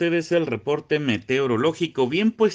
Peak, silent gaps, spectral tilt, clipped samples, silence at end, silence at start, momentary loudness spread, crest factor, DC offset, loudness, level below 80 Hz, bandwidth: -8 dBFS; none; -6 dB/octave; under 0.1%; 0 s; 0 s; 3 LU; 14 dB; under 0.1%; -22 LUFS; -64 dBFS; 9.4 kHz